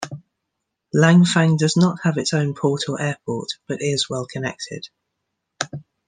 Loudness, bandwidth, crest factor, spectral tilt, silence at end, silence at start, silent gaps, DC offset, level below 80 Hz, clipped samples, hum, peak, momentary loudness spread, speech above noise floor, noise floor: -20 LUFS; 9.8 kHz; 20 dB; -5.5 dB/octave; 0.25 s; 0 s; none; under 0.1%; -62 dBFS; under 0.1%; none; -2 dBFS; 17 LU; 60 dB; -79 dBFS